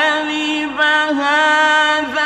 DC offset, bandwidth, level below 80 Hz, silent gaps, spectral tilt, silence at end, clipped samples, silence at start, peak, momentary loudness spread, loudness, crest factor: under 0.1%; 12 kHz; -58 dBFS; none; -1.5 dB/octave; 0 s; under 0.1%; 0 s; -4 dBFS; 6 LU; -14 LUFS; 12 dB